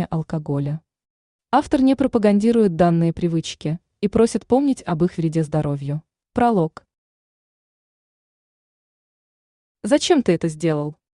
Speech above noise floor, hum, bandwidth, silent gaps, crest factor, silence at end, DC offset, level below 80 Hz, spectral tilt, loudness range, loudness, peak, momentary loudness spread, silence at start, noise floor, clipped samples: over 71 dB; none; 11 kHz; 1.10-1.39 s, 6.98-9.75 s; 18 dB; 0.25 s; under 0.1%; -50 dBFS; -6.5 dB/octave; 8 LU; -20 LUFS; -4 dBFS; 11 LU; 0 s; under -90 dBFS; under 0.1%